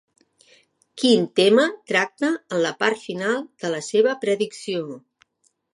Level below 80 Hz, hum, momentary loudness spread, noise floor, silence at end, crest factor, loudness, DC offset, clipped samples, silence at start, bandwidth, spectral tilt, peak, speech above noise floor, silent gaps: -78 dBFS; none; 11 LU; -63 dBFS; 0.8 s; 18 dB; -21 LUFS; under 0.1%; under 0.1%; 0.95 s; 11.5 kHz; -4 dB/octave; -4 dBFS; 42 dB; none